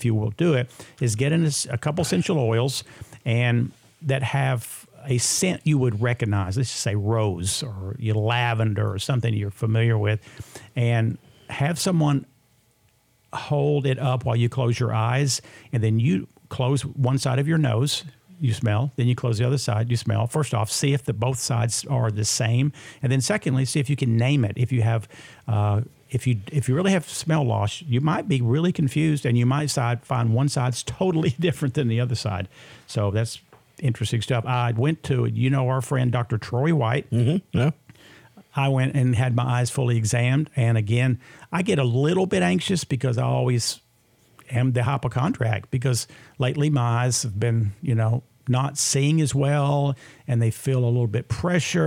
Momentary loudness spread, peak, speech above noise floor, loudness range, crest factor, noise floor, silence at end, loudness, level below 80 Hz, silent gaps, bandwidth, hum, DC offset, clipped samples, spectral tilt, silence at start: 6 LU; -8 dBFS; 40 dB; 2 LU; 16 dB; -62 dBFS; 0 s; -23 LUFS; -56 dBFS; none; 15.5 kHz; none; under 0.1%; under 0.1%; -5.5 dB/octave; 0 s